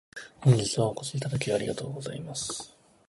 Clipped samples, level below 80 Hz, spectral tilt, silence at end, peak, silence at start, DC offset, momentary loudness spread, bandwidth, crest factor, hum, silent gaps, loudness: under 0.1%; -60 dBFS; -5 dB/octave; 0.4 s; -10 dBFS; 0.15 s; under 0.1%; 14 LU; 11.5 kHz; 20 dB; none; none; -29 LUFS